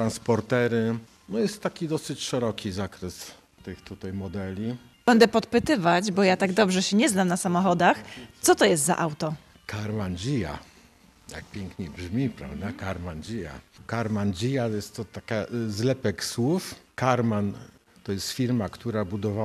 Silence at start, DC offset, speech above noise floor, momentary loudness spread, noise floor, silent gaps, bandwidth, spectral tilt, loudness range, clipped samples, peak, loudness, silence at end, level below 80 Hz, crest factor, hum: 0 s; under 0.1%; 30 dB; 16 LU; -56 dBFS; none; 14.5 kHz; -5 dB/octave; 11 LU; under 0.1%; -6 dBFS; -26 LUFS; 0 s; -56 dBFS; 20 dB; none